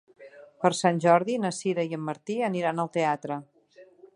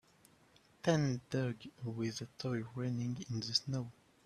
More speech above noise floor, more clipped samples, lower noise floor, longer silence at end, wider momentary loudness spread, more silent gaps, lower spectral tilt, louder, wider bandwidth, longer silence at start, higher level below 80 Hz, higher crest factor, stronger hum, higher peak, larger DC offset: about the same, 29 dB vs 30 dB; neither; second, -55 dBFS vs -67 dBFS; about the same, 0.3 s vs 0.35 s; about the same, 10 LU vs 8 LU; neither; about the same, -5.5 dB/octave vs -5.5 dB/octave; first, -27 LUFS vs -38 LUFS; second, 11.5 kHz vs 13 kHz; second, 0.2 s vs 0.85 s; second, -78 dBFS vs -70 dBFS; about the same, 22 dB vs 22 dB; neither; first, -6 dBFS vs -16 dBFS; neither